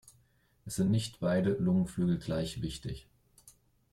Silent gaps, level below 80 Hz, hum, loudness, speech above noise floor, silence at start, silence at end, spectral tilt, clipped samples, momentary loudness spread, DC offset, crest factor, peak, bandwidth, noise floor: none; -56 dBFS; none; -32 LUFS; 38 dB; 0.65 s; 0.45 s; -6.5 dB/octave; under 0.1%; 13 LU; under 0.1%; 14 dB; -18 dBFS; 13.5 kHz; -69 dBFS